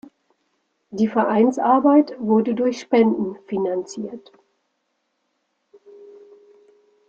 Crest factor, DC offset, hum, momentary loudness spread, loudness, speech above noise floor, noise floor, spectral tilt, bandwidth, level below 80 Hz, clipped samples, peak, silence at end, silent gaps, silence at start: 18 dB; under 0.1%; none; 16 LU; -19 LUFS; 54 dB; -73 dBFS; -7 dB/octave; 7.8 kHz; -68 dBFS; under 0.1%; -4 dBFS; 1 s; none; 0.9 s